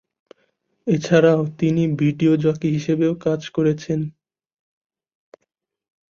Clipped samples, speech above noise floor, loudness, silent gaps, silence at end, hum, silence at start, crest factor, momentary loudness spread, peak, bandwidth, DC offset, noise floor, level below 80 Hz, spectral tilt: under 0.1%; 57 dB; -19 LUFS; none; 2 s; none; 0.85 s; 20 dB; 9 LU; -2 dBFS; 7.2 kHz; under 0.1%; -76 dBFS; -58 dBFS; -7.5 dB/octave